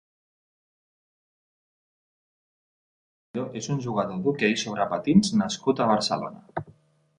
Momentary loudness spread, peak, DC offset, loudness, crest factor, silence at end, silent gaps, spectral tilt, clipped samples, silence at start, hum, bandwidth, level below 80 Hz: 15 LU; -6 dBFS; under 0.1%; -25 LUFS; 22 dB; 0.5 s; none; -5 dB/octave; under 0.1%; 3.35 s; none; 10.5 kHz; -60 dBFS